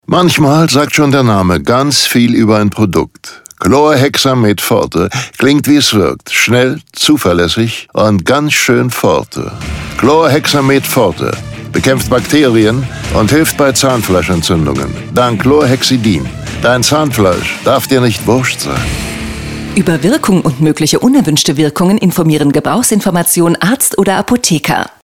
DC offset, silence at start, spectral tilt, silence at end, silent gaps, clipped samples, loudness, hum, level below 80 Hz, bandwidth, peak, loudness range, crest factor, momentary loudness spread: under 0.1%; 0.1 s; -4.5 dB/octave; 0.15 s; none; under 0.1%; -10 LUFS; none; -34 dBFS; 19 kHz; 0 dBFS; 2 LU; 10 dB; 8 LU